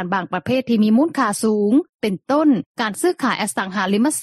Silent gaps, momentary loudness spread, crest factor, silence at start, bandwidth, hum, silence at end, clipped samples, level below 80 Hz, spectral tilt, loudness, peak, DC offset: 1.89-1.98 s, 2.66-2.75 s; 6 LU; 14 dB; 0 s; 13.5 kHz; none; 0 s; under 0.1%; -62 dBFS; -5 dB/octave; -19 LUFS; -6 dBFS; under 0.1%